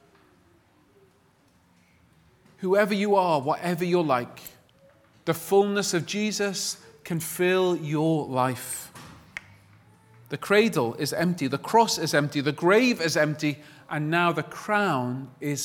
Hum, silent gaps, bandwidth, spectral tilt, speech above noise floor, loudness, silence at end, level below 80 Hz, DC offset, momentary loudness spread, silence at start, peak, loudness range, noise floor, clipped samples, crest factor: none; none; 19 kHz; -4.5 dB/octave; 37 dB; -25 LUFS; 0 s; -68 dBFS; under 0.1%; 15 LU; 2.6 s; -6 dBFS; 4 LU; -62 dBFS; under 0.1%; 20 dB